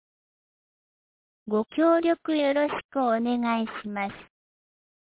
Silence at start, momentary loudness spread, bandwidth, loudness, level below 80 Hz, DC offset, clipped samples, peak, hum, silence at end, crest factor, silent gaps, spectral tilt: 1.45 s; 10 LU; 4 kHz; -26 LUFS; -68 dBFS; under 0.1%; under 0.1%; -12 dBFS; none; 0.8 s; 16 dB; 2.84-2.89 s; -9 dB/octave